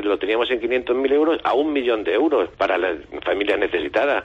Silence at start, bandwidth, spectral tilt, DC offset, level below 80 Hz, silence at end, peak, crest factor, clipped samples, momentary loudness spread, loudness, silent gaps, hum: 0 s; 7.8 kHz; -5.5 dB/octave; under 0.1%; -52 dBFS; 0 s; -8 dBFS; 14 dB; under 0.1%; 4 LU; -20 LUFS; none; none